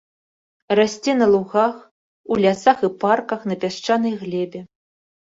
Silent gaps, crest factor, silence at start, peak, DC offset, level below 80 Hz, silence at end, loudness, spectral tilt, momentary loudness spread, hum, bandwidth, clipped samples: 1.91-2.24 s; 18 dB; 0.7 s; -2 dBFS; under 0.1%; -62 dBFS; 0.65 s; -20 LUFS; -5.5 dB/octave; 10 LU; none; 7.8 kHz; under 0.1%